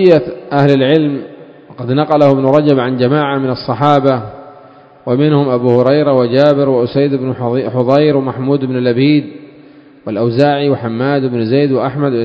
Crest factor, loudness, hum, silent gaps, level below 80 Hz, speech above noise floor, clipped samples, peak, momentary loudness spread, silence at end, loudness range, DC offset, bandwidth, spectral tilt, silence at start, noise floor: 12 dB; -12 LUFS; none; none; -54 dBFS; 28 dB; 0.3%; 0 dBFS; 8 LU; 0 s; 2 LU; under 0.1%; 7.4 kHz; -9 dB/octave; 0 s; -40 dBFS